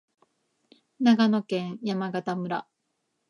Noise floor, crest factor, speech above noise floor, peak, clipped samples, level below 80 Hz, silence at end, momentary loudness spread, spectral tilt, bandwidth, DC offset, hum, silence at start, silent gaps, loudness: -78 dBFS; 20 dB; 53 dB; -8 dBFS; under 0.1%; -80 dBFS; 0.65 s; 11 LU; -6.5 dB/octave; 10.5 kHz; under 0.1%; none; 1 s; none; -26 LUFS